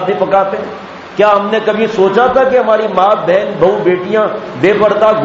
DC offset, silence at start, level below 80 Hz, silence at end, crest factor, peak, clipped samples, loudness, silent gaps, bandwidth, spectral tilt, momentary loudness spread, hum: under 0.1%; 0 s; -48 dBFS; 0 s; 10 dB; 0 dBFS; under 0.1%; -11 LUFS; none; 7.6 kHz; -6.5 dB/octave; 8 LU; none